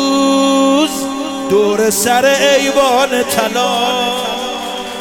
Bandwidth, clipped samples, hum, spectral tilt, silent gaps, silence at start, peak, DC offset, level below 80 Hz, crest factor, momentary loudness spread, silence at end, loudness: 18 kHz; under 0.1%; none; -2.5 dB/octave; none; 0 s; 0 dBFS; under 0.1%; -48 dBFS; 12 dB; 9 LU; 0 s; -13 LUFS